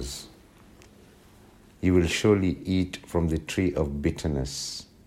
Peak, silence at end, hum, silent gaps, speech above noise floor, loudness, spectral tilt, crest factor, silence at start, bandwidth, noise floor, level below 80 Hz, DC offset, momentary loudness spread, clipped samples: -8 dBFS; 0.25 s; none; none; 28 dB; -26 LUFS; -5.5 dB/octave; 20 dB; 0 s; 15.5 kHz; -53 dBFS; -42 dBFS; under 0.1%; 12 LU; under 0.1%